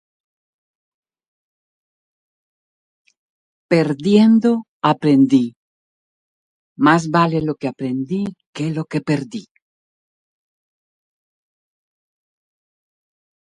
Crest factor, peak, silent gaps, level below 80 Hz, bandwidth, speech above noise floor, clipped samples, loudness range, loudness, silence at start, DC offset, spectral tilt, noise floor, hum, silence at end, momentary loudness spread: 22 dB; 0 dBFS; 4.68-4.80 s, 5.56-6.76 s, 8.46-8.53 s; -62 dBFS; 10.5 kHz; over 74 dB; under 0.1%; 11 LU; -17 LUFS; 3.7 s; under 0.1%; -7 dB/octave; under -90 dBFS; none; 4.2 s; 11 LU